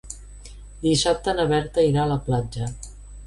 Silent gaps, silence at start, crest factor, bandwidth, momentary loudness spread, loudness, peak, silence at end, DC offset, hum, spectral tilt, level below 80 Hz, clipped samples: none; 0.05 s; 14 dB; 11.5 kHz; 21 LU; -23 LUFS; -8 dBFS; 0 s; under 0.1%; 50 Hz at -35 dBFS; -5 dB/octave; -40 dBFS; under 0.1%